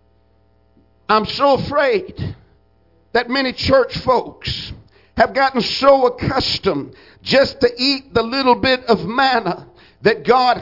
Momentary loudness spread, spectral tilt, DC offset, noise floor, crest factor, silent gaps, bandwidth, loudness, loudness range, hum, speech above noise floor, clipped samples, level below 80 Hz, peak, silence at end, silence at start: 13 LU; -5.5 dB/octave; under 0.1%; -57 dBFS; 18 dB; none; 5.8 kHz; -16 LUFS; 4 LU; none; 40 dB; under 0.1%; -44 dBFS; 0 dBFS; 0 s; 1.1 s